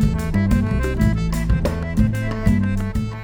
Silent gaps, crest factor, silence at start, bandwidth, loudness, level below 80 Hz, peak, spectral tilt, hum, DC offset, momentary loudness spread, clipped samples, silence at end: none; 16 dB; 0 s; over 20 kHz; -20 LUFS; -24 dBFS; -4 dBFS; -7.5 dB/octave; none; under 0.1%; 3 LU; under 0.1%; 0 s